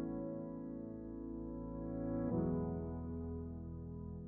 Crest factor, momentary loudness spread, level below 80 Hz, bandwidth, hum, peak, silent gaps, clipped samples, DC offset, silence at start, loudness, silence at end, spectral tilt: 16 dB; 10 LU; -54 dBFS; 2.5 kHz; none; -26 dBFS; none; under 0.1%; under 0.1%; 0 s; -43 LUFS; 0 s; -10 dB/octave